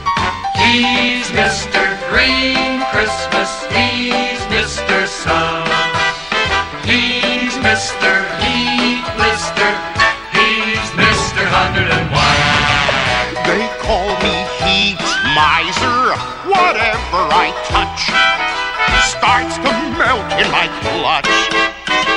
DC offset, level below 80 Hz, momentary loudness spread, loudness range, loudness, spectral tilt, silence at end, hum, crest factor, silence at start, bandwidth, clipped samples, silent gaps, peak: under 0.1%; -34 dBFS; 5 LU; 2 LU; -13 LUFS; -3 dB/octave; 0 s; none; 14 dB; 0 s; 11.5 kHz; under 0.1%; none; 0 dBFS